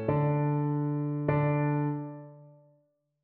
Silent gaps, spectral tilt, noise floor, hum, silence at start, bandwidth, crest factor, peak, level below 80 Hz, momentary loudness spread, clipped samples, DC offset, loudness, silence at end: none; -10 dB/octave; -71 dBFS; none; 0 s; 3.2 kHz; 16 dB; -14 dBFS; -60 dBFS; 10 LU; under 0.1%; under 0.1%; -29 LUFS; 0.75 s